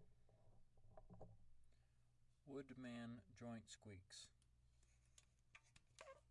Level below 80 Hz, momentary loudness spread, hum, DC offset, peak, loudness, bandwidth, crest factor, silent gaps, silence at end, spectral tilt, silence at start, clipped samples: -76 dBFS; 11 LU; none; under 0.1%; -44 dBFS; -59 LUFS; 11 kHz; 18 dB; none; 0 s; -5 dB/octave; 0 s; under 0.1%